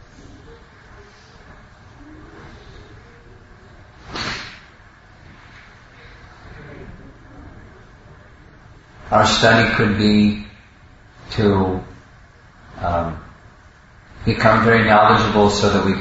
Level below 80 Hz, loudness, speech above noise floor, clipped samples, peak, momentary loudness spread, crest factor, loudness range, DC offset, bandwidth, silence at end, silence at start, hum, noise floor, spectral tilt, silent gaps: -42 dBFS; -16 LUFS; 32 dB; under 0.1%; 0 dBFS; 27 LU; 20 dB; 24 LU; under 0.1%; 8 kHz; 0 s; 0.5 s; none; -47 dBFS; -5.5 dB/octave; none